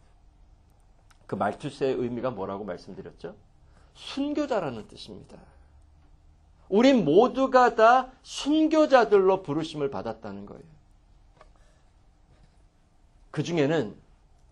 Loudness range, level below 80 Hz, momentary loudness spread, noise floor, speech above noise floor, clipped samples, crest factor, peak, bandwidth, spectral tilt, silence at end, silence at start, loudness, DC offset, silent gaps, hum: 14 LU; -58 dBFS; 23 LU; -60 dBFS; 35 dB; under 0.1%; 20 dB; -6 dBFS; 10.5 kHz; -6 dB/octave; 0.55 s; 1.3 s; -24 LUFS; under 0.1%; none; none